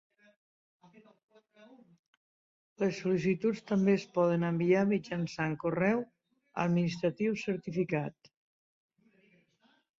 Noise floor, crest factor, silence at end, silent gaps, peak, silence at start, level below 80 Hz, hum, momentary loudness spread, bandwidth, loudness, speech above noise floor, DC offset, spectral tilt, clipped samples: -70 dBFS; 18 dB; 1.9 s; none; -16 dBFS; 2.8 s; -70 dBFS; none; 7 LU; 7.6 kHz; -31 LUFS; 40 dB; under 0.1%; -7.5 dB/octave; under 0.1%